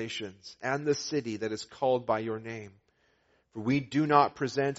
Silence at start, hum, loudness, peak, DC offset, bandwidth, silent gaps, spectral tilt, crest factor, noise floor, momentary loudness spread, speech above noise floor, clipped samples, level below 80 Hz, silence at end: 0 s; none; -30 LUFS; -8 dBFS; under 0.1%; 8 kHz; none; -4.5 dB/octave; 24 dB; -70 dBFS; 15 LU; 40 dB; under 0.1%; -68 dBFS; 0 s